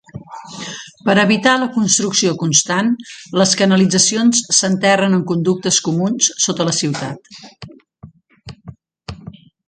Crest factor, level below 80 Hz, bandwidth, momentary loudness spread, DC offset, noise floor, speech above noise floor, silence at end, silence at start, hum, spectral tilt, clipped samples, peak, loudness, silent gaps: 18 dB; -52 dBFS; 9.6 kHz; 21 LU; under 0.1%; -43 dBFS; 27 dB; 0.35 s; 0.15 s; none; -3.5 dB/octave; under 0.1%; 0 dBFS; -14 LUFS; none